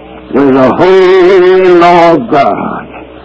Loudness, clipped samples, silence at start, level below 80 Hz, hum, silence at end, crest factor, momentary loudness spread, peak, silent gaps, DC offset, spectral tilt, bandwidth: -5 LUFS; 9%; 0 s; -40 dBFS; none; 0.05 s; 6 dB; 11 LU; 0 dBFS; none; under 0.1%; -7 dB/octave; 8 kHz